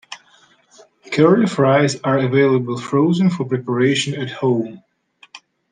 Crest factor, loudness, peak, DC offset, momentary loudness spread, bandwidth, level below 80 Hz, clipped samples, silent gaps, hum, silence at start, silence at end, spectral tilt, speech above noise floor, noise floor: 16 dB; -17 LUFS; -2 dBFS; under 0.1%; 9 LU; 9.8 kHz; -64 dBFS; under 0.1%; none; none; 0.1 s; 0.35 s; -6 dB/octave; 37 dB; -53 dBFS